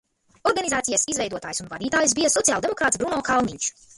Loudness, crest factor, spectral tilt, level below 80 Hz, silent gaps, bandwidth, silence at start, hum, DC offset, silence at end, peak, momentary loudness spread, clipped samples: -22 LUFS; 20 dB; -2 dB/octave; -54 dBFS; none; 12 kHz; 0.45 s; none; under 0.1%; 0.25 s; -4 dBFS; 9 LU; under 0.1%